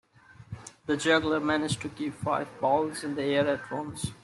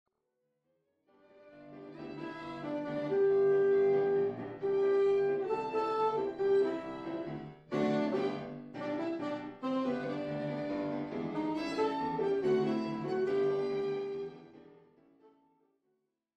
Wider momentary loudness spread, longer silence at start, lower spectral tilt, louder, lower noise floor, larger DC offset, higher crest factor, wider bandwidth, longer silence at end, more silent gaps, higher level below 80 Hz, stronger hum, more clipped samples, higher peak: about the same, 13 LU vs 14 LU; second, 0.3 s vs 1.45 s; second, -4.5 dB/octave vs -7.5 dB/octave; first, -28 LUFS vs -33 LUFS; second, -48 dBFS vs -82 dBFS; neither; first, 20 dB vs 14 dB; first, 12.5 kHz vs 7.8 kHz; second, 0.1 s vs 1.75 s; neither; first, -60 dBFS vs -72 dBFS; neither; neither; first, -10 dBFS vs -20 dBFS